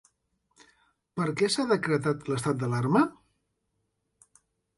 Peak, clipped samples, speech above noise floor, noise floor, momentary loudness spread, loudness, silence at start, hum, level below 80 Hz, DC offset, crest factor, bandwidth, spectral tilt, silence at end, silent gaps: -10 dBFS; under 0.1%; 52 dB; -78 dBFS; 6 LU; -27 LUFS; 1.15 s; none; -66 dBFS; under 0.1%; 20 dB; 11.5 kHz; -5.5 dB/octave; 1.65 s; none